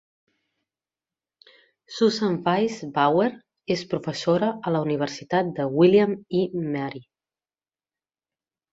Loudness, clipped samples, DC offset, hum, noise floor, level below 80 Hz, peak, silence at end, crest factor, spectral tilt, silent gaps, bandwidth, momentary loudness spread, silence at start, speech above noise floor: -23 LUFS; under 0.1%; under 0.1%; none; under -90 dBFS; -66 dBFS; -6 dBFS; 1.7 s; 18 dB; -6.5 dB/octave; none; 7.8 kHz; 10 LU; 1.9 s; over 67 dB